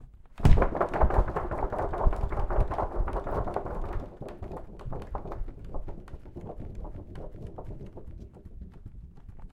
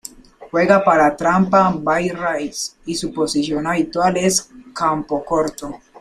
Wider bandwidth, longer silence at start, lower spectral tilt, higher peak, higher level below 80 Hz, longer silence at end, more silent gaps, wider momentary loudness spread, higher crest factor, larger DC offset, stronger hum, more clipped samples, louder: second, 5.8 kHz vs 15.5 kHz; second, 0 s vs 0.4 s; first, -8.5 dB/octave vs -4.5 dB/octave; about the same, -4 dBFS vs -2 dBFS; first, -32 dBFS vs -48 dBFS; second, 0 s vs 0.25 s; neither; first, 21 LU vs 11 LU; first, 26 dB vs 16 dB; neither; neither; neither; second, -32 LUFS vs -18 LUFS